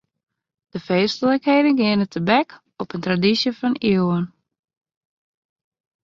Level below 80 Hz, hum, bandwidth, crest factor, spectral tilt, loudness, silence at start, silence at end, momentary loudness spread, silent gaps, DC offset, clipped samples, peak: -60 dBFS; none; 7.4 kHz; 20 dB; -6.5 dB/octave; -19 LUFS; 0.75 s; 1.75 s; 14 LU; none; under 0.1%; under 0.1%; -2 dBFS